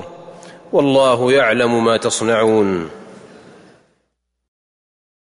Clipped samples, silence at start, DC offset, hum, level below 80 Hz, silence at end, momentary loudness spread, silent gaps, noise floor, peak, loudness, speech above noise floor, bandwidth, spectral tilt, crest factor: under 0.1%; 0 s; under 0.1%; none; -58 dBFS; 2.15 s; 9 LU; none; -71 dBFS; -4 dBFS; -15 LUFS; 56 dB; 11 kHz; -4.5 dB/octave; 14 dB